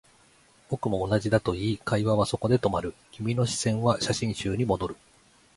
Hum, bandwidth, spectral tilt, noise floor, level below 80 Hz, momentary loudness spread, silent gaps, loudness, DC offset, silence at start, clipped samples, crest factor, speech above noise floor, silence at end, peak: none; 11.5 kHz; -5.5 dB/octave; -59 dBFS; -50 dBFS; 9 LU; none; -27 LUFS; under 0.1%; 0.7 s; under 0.1%; 20 dB; 33 dB; 0.6 s; -8 dBFS